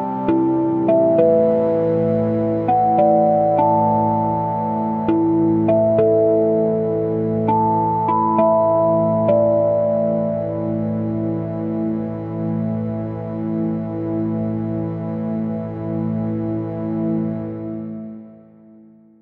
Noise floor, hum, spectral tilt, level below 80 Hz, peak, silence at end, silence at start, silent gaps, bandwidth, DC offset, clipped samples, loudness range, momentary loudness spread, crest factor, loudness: -47 dBFS; none; -12 dB/octave; -52 dBFS; -4 dBFS; 0.85 s; 0 s; none; 4.2 kHz; under 0.1%; under 0.1%; 7 LU; 10 LU; 14 dB; -19 LUFS